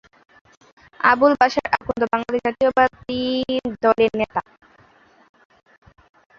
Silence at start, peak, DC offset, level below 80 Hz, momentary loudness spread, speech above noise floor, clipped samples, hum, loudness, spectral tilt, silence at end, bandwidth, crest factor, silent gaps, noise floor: 1 s; -2 dBFS; under 0.1%; -54 dBFS; 9 LU; 34 dB; under 0.1%; none; -19 LUFS; -5.5 dB/octave; 2 s; 7.4 kHz; 20 dB; none; -54 dBFS